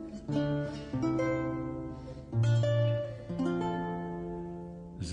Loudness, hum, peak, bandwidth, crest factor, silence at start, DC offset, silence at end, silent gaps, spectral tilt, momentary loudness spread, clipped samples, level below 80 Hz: -33 LUFS; none; -20 dBFS; 9.2 kHz; 14 dB; 0 s; under 0.1%; 0 s; none; -8 dB/octave; 13 LU; under 0.1%; -52 dBFS